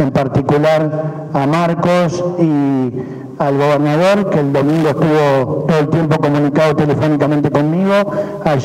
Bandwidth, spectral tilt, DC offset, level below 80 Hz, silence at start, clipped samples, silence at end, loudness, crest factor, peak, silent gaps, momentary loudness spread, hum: 13.5 kHz; -7.5 dB/octave; under 0.1%; -46 dBFS; 0 s; under 0.1%; 0 s; -14 LUFS; 10 dB; -2 dBFS; none; 6 LU; none